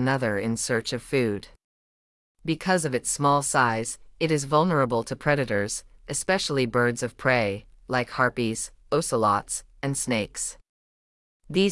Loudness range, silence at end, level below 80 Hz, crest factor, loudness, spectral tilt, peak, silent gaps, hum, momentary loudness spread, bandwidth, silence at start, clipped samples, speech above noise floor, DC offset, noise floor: 3 LU; 0 s; -52 dBFS; 18 dB; -25 LUFS; -4 dB/octave; -8 dBFS; 1.64-2.35 s, 10.69-11.40 s; none; 9 LU; 12 kHz; 0 s; under 0.1%; over 65 dB; under 0.1%; under -90 dBFS